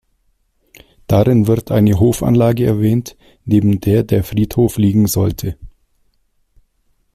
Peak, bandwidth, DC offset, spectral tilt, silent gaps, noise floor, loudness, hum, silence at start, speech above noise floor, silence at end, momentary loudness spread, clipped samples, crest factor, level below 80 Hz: -2 dBFS; 15.5 kHz; under 0.1%; -7.5 dB/octave; none; -61 dBFS; -14 LUFS; none; 1.1 s; 48 dB; 1.45 s; 9 LU; under 0.1%; 14 dB; -38 dBFS